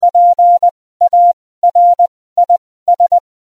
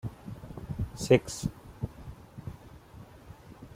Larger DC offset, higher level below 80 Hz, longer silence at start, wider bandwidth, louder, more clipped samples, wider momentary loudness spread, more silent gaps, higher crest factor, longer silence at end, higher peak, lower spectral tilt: first, 0.3% vs under 0.1%; second, -62 dBFS vs -50 dBFS; about the same, 0 s vs 0.05 s; second, 1.2 kHz vs 16 kHz; first, -11 LUFS vs -31 LUFS; neither; second, 7 LU vs 26 LU; first, 0.71-1.00 s, 1.33-1.62 s, 2.08-2.36 s, 2.58-2.86 s vs none; second, 8 dB vs 26 dB; first, 0.25 s vs 0 s; first, -4 dBFS vs -8 dBFS; second, -4 dB/octave vs -6 dB/octave